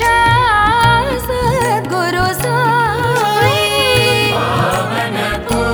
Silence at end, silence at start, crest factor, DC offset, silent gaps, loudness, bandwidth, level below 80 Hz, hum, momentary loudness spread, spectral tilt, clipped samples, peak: 0 s; 0 s; 14 dB; under 0.1%; none; -13 LUFS; over 20 kHz; -32 dBFS; none; 6 LU; -4 dB/octave; under 0.1%; 0 dBFS